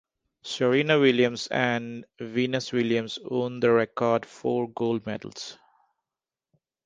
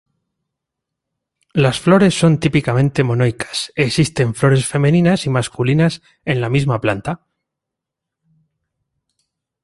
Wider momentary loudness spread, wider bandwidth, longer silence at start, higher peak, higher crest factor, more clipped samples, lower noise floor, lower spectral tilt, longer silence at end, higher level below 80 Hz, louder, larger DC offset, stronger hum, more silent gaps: first, 16 LU vs 9 LU; second, 9.6 kHz vs 11.5 kHz; second, 0.45 s vs 1.55 s; second, -6 dBFS vs -2 dBFS; about the same, 20 dB vs 16 dB; neither; first, under -90 dBFS vs -82 dBFS; about the same, -5.5 dB/octave vs -6 dB/octave; second, 1.3 s vs 2.5 s; second, -68 dBFS vs -48 dBFS; second, -25 LUFS vs -16 LUFS; neither; neither; neither